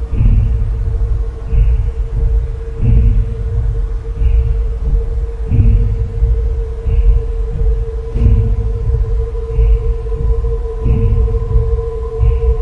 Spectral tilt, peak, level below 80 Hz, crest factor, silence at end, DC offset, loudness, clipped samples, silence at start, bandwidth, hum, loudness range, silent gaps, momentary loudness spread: -10 dB/octave; 0 dBFS; -14 dBFS; 12 dB; 0 s; under 0.1%; -17 LUFS; under 0.1%; 0 s; 3.1 kHz; none; 1 LU; none; 7 LU